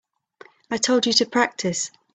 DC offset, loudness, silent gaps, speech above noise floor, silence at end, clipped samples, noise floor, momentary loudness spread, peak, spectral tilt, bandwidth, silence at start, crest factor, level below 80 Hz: under 0.1%; -21 LUFS; none; 29 dB; 0.25 s; under 0.1%; -51 dBFS; 9 LU; -4 dBFS; -2.5 dB/octave; 9.2 kHz; 0.7 s; 20 dB; -66 dBFS